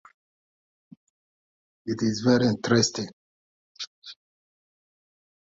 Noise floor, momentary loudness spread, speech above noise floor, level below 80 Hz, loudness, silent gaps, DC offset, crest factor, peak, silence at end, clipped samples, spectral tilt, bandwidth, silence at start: under -90 dBFS; 18 LU; over 67 dB; -64 dBFS; -24 LUFS; 3.13-3.75 s, 3.87-4.02 s; under 0.1%; 22 dB; -8 dBFS; 1.45 s; under 0.1%; -5 dB/octave; 7.8 kHz; 1.85 s